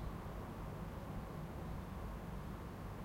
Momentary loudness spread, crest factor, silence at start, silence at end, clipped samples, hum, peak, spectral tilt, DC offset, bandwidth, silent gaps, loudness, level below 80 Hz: 1 LU; 12 dB; 0 s; 0 s; under 0.1%; none; -34 dBFS; -7 dB/octave; under 0.1%; 16 kHz; none; -48 LUFS; -52 dBFS